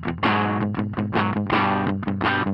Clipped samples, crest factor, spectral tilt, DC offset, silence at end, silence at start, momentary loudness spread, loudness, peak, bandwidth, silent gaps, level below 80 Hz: under 0.1%; 14 dB; -8.5 dB/octave; under 0.1%; 0 s; 0 s; 4 LU; -23 LUFS; -8 dBFS; 5.8 kHz; none; -52 dBFS